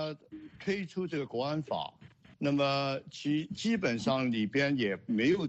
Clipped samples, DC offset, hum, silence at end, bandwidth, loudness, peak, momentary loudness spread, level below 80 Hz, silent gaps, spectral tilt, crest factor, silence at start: under 0.1%; under 0.1%; none; 0 s; 8.4 kHz; -32 LUFS; -16 dBFS; 9 LU; -68 dBFS; none; -6 dB/octave; 16 dB; 0 s